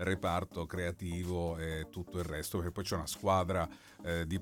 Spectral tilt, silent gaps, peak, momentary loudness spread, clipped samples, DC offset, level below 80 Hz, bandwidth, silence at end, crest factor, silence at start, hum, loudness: -5.5 dB/octave; none; -18 dBFS; 9 LU; under 0.1%; under 0.1%; -54 dBFS; 18 kHz; 0 s; 18 dB; 0 s; none; -37 LUFS